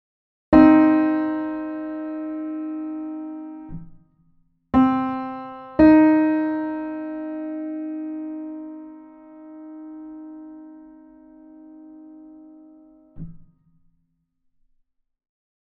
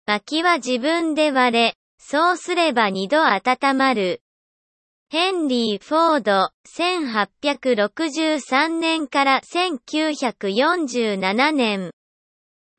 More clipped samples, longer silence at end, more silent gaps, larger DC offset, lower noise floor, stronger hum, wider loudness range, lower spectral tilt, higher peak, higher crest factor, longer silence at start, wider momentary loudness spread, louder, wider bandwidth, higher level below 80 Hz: neither; first, 2.35 s vs 0.85 s; second, none vs 1.75-1.98 s, 4.21-5.06 s, 6.54-6.64 s; neither; second, -70 dBFS vs under -90 dBFS; neither; first, 22 LU vs 2 LU; first, -9.5 dB/octave vs -3.5 dB/octave; about the same, -2 dBFS vs -4 dBFS; first, 22 dB vs 16 dB; first, 0.5 s vs 0.1 s; first, 27 LU vs 5 LU; about the same, -20 LUFS vs -20 LUFS; second, 4.4 kHz vs 8.8 kHz; first, -48 dBFS vs -72 dBFS